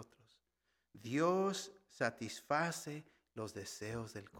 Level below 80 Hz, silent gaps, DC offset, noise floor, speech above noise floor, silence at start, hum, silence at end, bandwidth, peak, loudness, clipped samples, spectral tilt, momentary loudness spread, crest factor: -74 dBFS; none; under 0.1%; -84 dBFS; 45 dB; 0 s; none; 0 s; 17.5 kHz; -20 dBFS; -40 LUFS; under 0.1%; -4.5 dB/octave; 17 LU; 22 dB